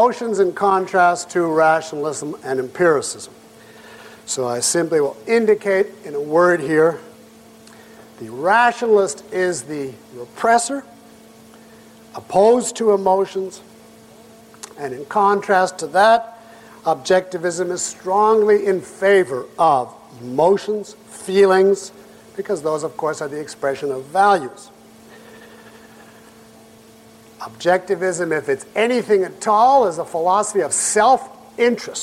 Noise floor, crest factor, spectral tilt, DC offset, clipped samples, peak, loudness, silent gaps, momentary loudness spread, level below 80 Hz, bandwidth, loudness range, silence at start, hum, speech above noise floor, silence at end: -46 dBFS; 16 dB; -3.5 dB/octave; under 0.1%; under 0.1%; -2 dBFS; -18 LUFS; none; 17 LU; -62 dBFS; 15 kHz; 6 LU; 0 s; none; 28 dB; 0 s